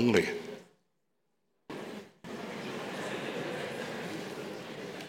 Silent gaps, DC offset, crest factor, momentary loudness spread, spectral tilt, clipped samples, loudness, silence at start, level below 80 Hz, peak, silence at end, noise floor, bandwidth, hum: none; under 0.1%; 24 dB; 11 LU; -5 dB/octave; under 0.1%; -37 LUFS; 0 s; -76 dBFS; -12 dBFS; 0 s; -81 dBFS; 16.5 kHz; none